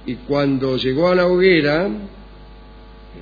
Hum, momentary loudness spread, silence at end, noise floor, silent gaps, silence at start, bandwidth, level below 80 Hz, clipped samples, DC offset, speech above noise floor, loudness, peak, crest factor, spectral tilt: none; 11 LU; 0 s; -40 dBFS; none; 0 s; 5 kHz; -42 dBFS; under 0.1%; under 0.1%; 23 dB; -17 LUFS; -2 dBFS; 16 dB; -8 dB/octave